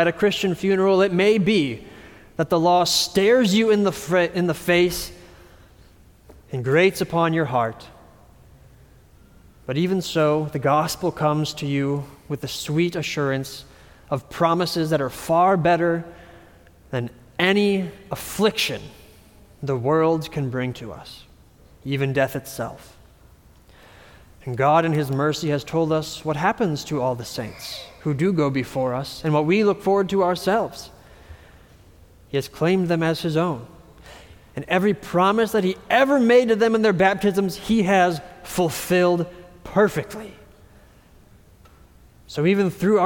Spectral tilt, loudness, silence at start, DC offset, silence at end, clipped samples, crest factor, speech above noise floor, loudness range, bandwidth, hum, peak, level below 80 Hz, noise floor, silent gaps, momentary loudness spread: -5.5 dB/octave; -21 LUFS; 0 s; under 0.1%; 0 s; under 0.1%; 18 dB; 30 dB; 7 LU; 19 kHz; none; -4 dBFS; -52 dBFS; -51 dBFS; none; 15 LU